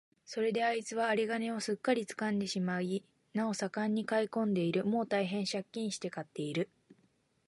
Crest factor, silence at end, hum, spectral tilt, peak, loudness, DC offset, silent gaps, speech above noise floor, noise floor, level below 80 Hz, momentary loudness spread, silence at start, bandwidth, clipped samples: 16 dB; 0.55 s; none; -5 dB/octave; -18 dBFS; -34 LUFS; under 0.1%; none; 39 dB; -72 dBFS; -80 dBFS; 7 LU; 0.3 s; 11.5 kHz; under 0.1%